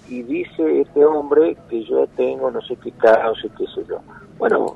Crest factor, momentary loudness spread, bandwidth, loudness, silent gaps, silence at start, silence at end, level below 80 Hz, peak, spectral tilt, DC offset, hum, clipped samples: 16 dB; 13 LU; 8 kHz; -19 LUFS; none; 0.1 s; 0 s; -56 dBFS; -2 dBFS; -6.5 dB/octave; under 0.1%; none; under 0.1%